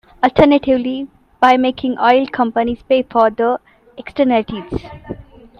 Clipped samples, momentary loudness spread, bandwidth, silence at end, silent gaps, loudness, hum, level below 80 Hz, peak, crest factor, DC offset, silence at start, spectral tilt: under 0.1%; 20 LU; 7 kHz; 0.35 s; none; -15 LUFS; none; -42 dBFS; 0 dBFS; 16 dB; under 0.1%; 0.2 s; -7 dB/octave